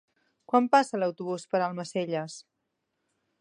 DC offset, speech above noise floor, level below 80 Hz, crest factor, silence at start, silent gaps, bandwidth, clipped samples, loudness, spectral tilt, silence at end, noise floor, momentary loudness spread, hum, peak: under 0.1%; 53 dB; -84 dBFS; 22 dB; 0.5 s; none; 11 kHz; under 0.1%; -28 LUFS; -5.5 dB/octave; 1 s; -80 dBFS; 13 LU; none; -8 dBFS